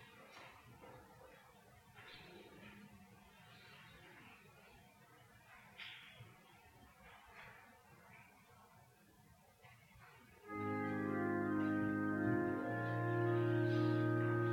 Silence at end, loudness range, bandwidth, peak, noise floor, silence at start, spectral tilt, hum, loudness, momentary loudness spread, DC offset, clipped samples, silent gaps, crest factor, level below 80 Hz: 0 s; 24 LU; 16 kHz; -26 dBFS; -67 dBFS; 0 s; -8 dB/octave; none; -39 LUFS; 26 LU; under 0.1%; under 0.1%; none; 18 dB; -76 dBFS